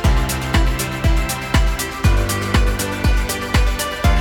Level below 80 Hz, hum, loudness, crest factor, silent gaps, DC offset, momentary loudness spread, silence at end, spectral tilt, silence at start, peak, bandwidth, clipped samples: -18 dBFS; none; -19 LUFS; 14 dB; none; under 0.1%; 2 LU; 0 s; -4.5 dB/octave; 0 s; -2 dBFS; 18 kHz; under 0.1%